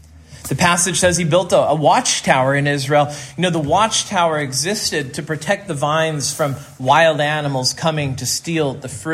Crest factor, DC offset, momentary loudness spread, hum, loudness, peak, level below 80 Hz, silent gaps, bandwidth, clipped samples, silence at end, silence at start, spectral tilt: 18 dB; under 0.1%; 9 LU; none; -17 LUFS; 0 dBFS; -48 dBFS; none; 16 kHz; under 0.1%; 0 s; 0.15 s; -3.5 dB/octave